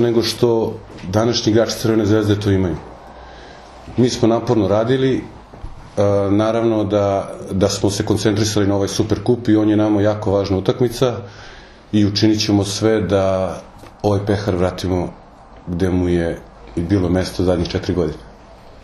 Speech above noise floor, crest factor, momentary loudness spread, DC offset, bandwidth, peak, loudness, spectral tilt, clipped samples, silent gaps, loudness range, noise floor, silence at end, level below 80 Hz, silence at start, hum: 24 dB; 18 dB; 15 LU; under 0.1%; 13 kHz; 0 dBFS; -18 LUFS; -6 dB/octave; under 0.1%; none; 3 LU; -41 dBFS; 0.1 s; -42 dBFS; 0 s; none